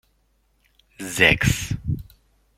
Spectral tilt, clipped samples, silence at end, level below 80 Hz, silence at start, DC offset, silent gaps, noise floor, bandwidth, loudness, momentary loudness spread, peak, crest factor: -4 dB/octave; under 0.1%; 0.55 s; -40 dBFS; 1 s; under 0.1%; none; -65 dBFS; 16.5 kHz; -20 LUFS; 15 LU; -2 dBFS; 24 dB